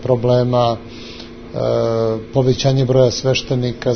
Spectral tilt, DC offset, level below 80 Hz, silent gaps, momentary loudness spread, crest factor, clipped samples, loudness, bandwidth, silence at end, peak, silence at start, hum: -6.5 dB/octave; under 0.1%; -42 dBFS; none; 17 LU; 16 dB; under 0.1%; -16 LUFS; 6.6 kHz; 0 s; -2 dBFS; 0 s; none